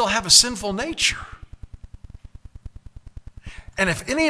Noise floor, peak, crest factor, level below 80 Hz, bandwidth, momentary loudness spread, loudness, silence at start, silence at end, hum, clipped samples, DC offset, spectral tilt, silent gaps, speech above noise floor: -42 dBFS; 0 dBFS; 24 dB; -42 dBFS; 11 kHz; 23 LU; -18 LUFS; 0 s; 0 s; none; under 0.1%; under 0.1%; -1.5 dB/octave; none; 22 dB